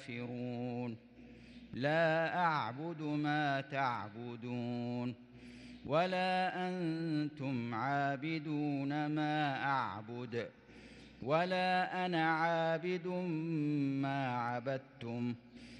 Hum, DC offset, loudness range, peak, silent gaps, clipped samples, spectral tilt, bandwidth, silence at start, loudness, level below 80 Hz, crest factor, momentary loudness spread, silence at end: none; under 0.1%; 3 LU; -20 dBFS; none; under 0.1%; -7 dB/octave; 10 kHz; 0 s; -36 LUFS; -74 dBFS; 16 dB; 14 LU; 0 s